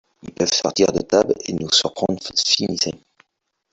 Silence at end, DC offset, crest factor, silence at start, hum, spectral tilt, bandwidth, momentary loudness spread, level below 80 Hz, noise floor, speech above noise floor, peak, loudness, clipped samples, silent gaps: 0.75 s; under 0.1%; 18 dB; 0.25 s; none; -3 dB/octave; 8.4 kHz; 7 LU; -54 dBFS; -75 dBFS; 55 dB; -2 dBFS; -19 LUFS; under 0.1%; none